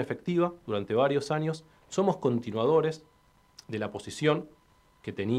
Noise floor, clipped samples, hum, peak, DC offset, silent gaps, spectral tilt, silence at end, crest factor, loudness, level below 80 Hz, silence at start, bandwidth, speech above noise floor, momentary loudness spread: -61 dBFS; under 0.1%; none; -10 dBFS; under 0.1%; none; -6.5 dB/octave; 0 s; 18 dB; -29 LUFS; -68 dBFS; 0 s; 12.5 kHz; 33 dB; 14 LU